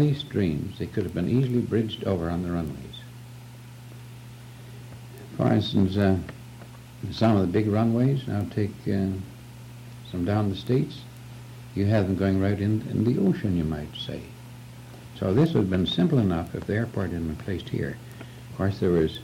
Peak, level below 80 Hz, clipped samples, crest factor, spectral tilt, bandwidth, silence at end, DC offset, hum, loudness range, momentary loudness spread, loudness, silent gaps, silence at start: -12 dBFS; -50 dBFS; under 0.1%; 14 dB; -8 dB/octave; 16.5 kHz; 0 s; under 0.1%; none; 5 LU; 21 LU; -26 LUFS; none; 0 s